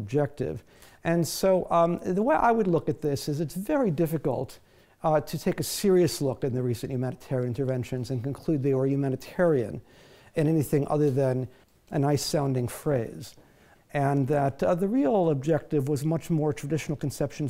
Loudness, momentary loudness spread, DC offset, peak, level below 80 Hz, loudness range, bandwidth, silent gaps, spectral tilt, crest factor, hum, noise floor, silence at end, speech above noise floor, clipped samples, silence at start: -27 LUFS; 9 LU; under 0.1%; -12 dBFS; -54 dBFS; 3 LU; 16 kHz; none; -6.5 dB/octave; 16 dB; none; -57 dBFS; 0 s; 31 dB; under 0.1%; 0 s